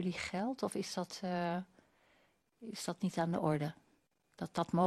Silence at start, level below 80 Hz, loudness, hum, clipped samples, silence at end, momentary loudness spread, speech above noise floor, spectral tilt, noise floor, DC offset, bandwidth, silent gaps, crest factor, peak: 0 s; -74 dBFS; -39 LUFS; none; under 0.1%; 0 s; 11 LU; 38 dB; -6 dB/octave; -75 dBFS; under 0.1%; 13 kHz; none; 22 dB; -16 dBFS